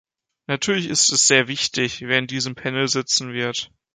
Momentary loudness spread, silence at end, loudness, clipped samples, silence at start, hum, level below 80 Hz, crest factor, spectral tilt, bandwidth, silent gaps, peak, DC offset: 11 LU; 0.3 s; -19 LUFS; under 0.1%; 0.5 s; none; -62 dBFS; 20 dB; -2 dB/octave; 10 kHz; none; -2 dBFS; under 0.1%